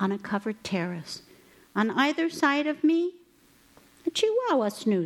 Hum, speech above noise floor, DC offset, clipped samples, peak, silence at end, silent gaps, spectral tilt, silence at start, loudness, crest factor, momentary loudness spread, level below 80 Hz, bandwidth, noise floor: none; 33 dB; under 0.1%; under 0.1%; -10 dBFS; 0 s; none; -5 dB/octave; 0 s; -27 LUFS; 18 dB; 10 LU; -72 dBFS; 14.5 kHz; -60 dBFS